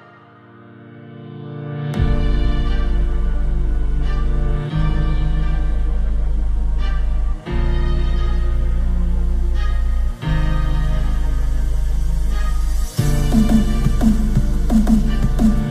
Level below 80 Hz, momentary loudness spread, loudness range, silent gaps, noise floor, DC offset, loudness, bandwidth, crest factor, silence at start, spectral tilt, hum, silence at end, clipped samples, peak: -18 dBFS; 6 LU; 4 LU; none; -44 dBFS; under 0.1%; -21 LUFS; 13 kHz; 16 dB; 0.8 s; -7 dB/octave; none; 0 s; under 0.1%; -2 dBFS